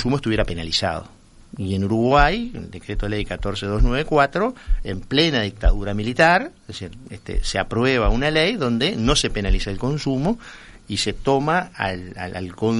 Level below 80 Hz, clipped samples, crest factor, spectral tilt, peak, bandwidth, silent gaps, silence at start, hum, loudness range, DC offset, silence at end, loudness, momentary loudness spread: -28 dBFS; under 0.1%; 20 dB; -5 dB/octave; 0 dBFS; 11.5 kHz; none; 0 s; none; 2 LU; under 0.1%; 0 s; -21 LUFS; 14 LU